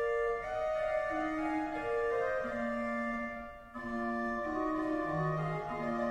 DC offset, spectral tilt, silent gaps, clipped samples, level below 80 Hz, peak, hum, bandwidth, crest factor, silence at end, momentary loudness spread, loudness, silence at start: under 0.1%; -7.5 dB/octave; none; under 0.1%; -56 dBFS; -22 dBFS; none; 11.5 kHz; 12 dB; 0 s; 5 LU; -35 LUFS; 0 s